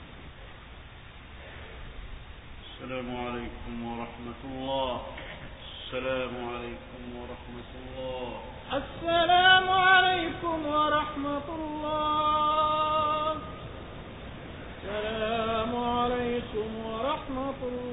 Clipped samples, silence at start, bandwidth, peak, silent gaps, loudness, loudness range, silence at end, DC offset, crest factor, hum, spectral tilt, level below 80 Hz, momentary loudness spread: under 0.1%; 0 s; 4 kHz; -8 dBFS; none; -28 LUFS; 15 LU; 0 s; under 0.1%; 22 dB; none; -8.5 dB/octave; -48 dBFS; 23 LU